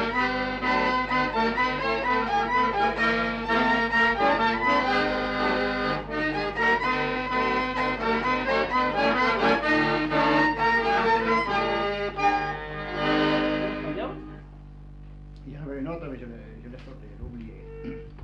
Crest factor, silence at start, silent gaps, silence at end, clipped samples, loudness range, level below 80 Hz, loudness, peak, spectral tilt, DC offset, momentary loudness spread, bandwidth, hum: 16 dB; 0 s; none; 0 s; under 0.1%; 14 LU; -44 dBFS; -24 LUFS; -10 dBFS; -5.5 dB/octave; under 0.1%; 18 LU; 9.4 kHz; 50 Hz at -45 dBFS